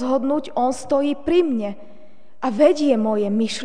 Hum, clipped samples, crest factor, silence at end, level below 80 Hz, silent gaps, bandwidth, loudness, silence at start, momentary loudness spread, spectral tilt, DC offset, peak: none; under 0.1%; 16 dB; 0 s; -56 dBFS; none; 10 kHz; -20 LUFS; 0 s; 10 LU; -5.5 dB/octave; 2%; -4 dBFS